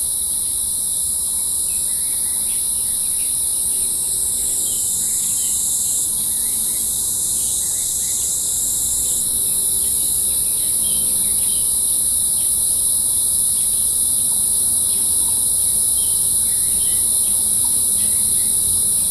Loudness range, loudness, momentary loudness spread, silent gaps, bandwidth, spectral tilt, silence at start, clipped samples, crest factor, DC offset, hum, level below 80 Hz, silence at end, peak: 3 LU; -15 LUFS; 3 LU; none; 15 kHz; 0 dB/octave; 0 s; under 0.1%; 14 dB; under 0.1%; none; -44 dBFS; 0 s; -4 dBFS